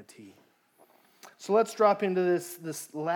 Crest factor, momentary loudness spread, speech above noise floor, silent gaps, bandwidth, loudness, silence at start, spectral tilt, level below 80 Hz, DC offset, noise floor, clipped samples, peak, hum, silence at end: 20 dB; 14 LU; 35 dB; none; 18.5 kHz; -27 LUFS; 0 s; -5.5 dB/octave; under -90 dBFS; under 0.1%; -63 dBFS; under 0.1%; -10 dBFS; none; 0 s